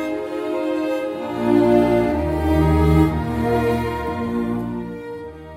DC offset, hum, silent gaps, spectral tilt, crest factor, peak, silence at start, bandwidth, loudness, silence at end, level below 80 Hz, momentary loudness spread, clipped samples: under 0.1%; none; none; -8 dB/octave; 16 dB; -4 dBFS; 0 s; 16 kHz; -20 LUFS; 0 s; -30 dBFS; 12 LU; under 0.1%